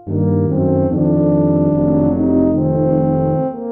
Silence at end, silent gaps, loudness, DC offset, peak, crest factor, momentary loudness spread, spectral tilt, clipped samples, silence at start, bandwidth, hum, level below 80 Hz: 0 s; none; -15 LUFS; under 0.1%; -4 dBFS; 12 dB; 2 LU; -14.5 dB/octave; under 0.1%; 0.05 s; 2.4 kHz; none; -42 dBFS